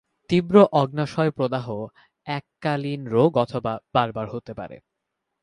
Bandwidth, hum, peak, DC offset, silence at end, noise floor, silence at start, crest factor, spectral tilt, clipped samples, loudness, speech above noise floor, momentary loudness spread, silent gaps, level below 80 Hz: 10.5 kHz; none; -4 dBFS; under 0.1%; 0.65 s; -80 dBFS; 0.3 s; 20 dB; -8 dB/octave; under 0.1%; -22 LUFS; 58 dB; 18 LU; none; -58 dBFS